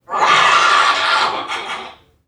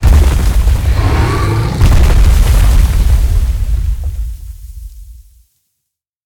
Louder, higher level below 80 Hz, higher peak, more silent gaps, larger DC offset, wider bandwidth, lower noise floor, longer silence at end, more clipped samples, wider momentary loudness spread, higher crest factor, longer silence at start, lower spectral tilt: about the same, -13 LUFS vs -12 LUFS; second, -62 dBFS vs -12 dBFS; about the same, 0 dBFS vs 0 dBFS; neither; neither; second, 12.5 kHz vs 17.5 kHz; second, -36 dBFS vs -74 dBFS; second, 0.35 s vs 1.1 s; neither; second, 14 LU vs 20 LU; about the same, 14 dB vs 10 dB; about the same, 0.1 s vs 0 s; second, -0.5 dB/octave vs -6 dB/octave